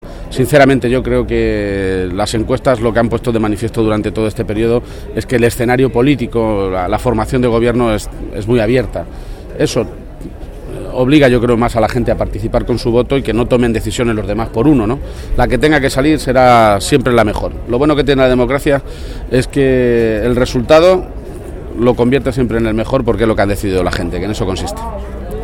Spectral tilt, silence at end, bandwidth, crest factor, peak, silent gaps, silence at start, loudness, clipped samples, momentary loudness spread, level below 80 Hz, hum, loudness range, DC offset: -6.5 dB/octave; 0 s; 18 kHz; 12 dB; 0 dBFS; none; 0.05 s; -13 LUFS; under 0.1%; 14 LU; -26 dBFS; none; 4 LU; under 0.1%